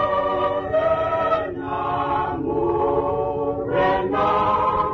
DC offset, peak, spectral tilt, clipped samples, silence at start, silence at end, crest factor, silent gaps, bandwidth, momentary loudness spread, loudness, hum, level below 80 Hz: under 0.1%; -8 dBFS; -8 dB/octave; under 0.1%; 0 s; 0 s; 12 dB; none; 6.8 kHz; 5 LU; -21 LUFS; none; -44 dBFS